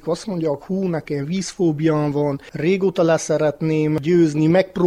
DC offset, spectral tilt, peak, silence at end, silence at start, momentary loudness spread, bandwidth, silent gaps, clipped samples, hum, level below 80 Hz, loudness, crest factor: under 0.1%; -6.5 dB/octave; -4 dBFS; 0 s; 0.05 s; 7 LU; 11.5 kHz; none; under 0.1%; none; -54 dBFS; -20 LUFS; 14 dB